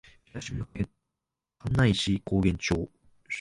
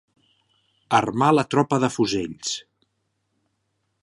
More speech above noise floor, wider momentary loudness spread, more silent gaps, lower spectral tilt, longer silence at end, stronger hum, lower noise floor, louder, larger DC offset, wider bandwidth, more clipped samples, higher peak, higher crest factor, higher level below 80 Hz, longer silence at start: first, 60 dB vs 53 dB; first, 16 LU vs 10 LU; neither; about the same, -5.5 dB/octave vs -5 dB/octave; second, 0 s vs 1.4 s; neither; first, -87 dBFS vs -74 dBFS; second, -28 LUFS vs -22 LUFS; neither; about the same, 11.5 kHz vs 11.5 kHz; neither; second, -10 dBFS vs -4 dBFS; about the same, 20 dB vs 22 dB; first, -44 dBFS vs -60 dBFS; second, 0.35 s vs 0.9 s